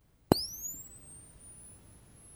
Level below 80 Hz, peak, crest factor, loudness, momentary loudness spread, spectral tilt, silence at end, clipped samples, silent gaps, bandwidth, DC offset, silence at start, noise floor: -54 dBFS; -2 dBFS; 36 dB; -33 LUFS; 23 LU; -4.5 dB/octave; 0 s; under 0.1%; none; over 20 kHz; under 0.1%; 0.3 s; -57 dBFS